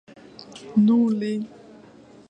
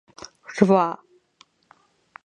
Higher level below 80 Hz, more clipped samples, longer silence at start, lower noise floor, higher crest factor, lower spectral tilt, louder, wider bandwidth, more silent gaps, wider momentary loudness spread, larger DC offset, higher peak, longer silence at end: about the same, -68 dBFS vs -66 dBFS; neither; about the same, 0.5 s vs 0.5 s; second, -49 dBFS vs -59 dBFS; second, 16 dB vs 24 dB; about the same, -8 dB/octave vs -7 dB/octave; about the same, -21 LUFS vs -20 LUFS; about the same, 8.6 kHz vs 9.2 kHz; neither; about the same, 23 LU vs 24 LU; neither; second, -8 dBFS vs 0 dBFS; second, 0.8 s vs 1.3 s